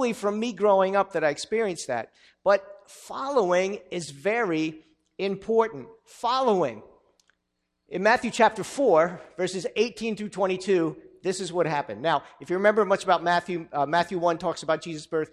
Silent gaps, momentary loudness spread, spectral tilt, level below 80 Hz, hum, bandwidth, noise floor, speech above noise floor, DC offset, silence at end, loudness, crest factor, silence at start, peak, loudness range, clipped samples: none; 10 LU; -4.5 dB/octave; -66 dBFS; none; 13.5 kHz; -78 dBFS; 53 dB; under 0.1%; 0.05 s; -25 LUFS; 20 dB; 0 s; -6 dBFS; 3 LU; under 0.1%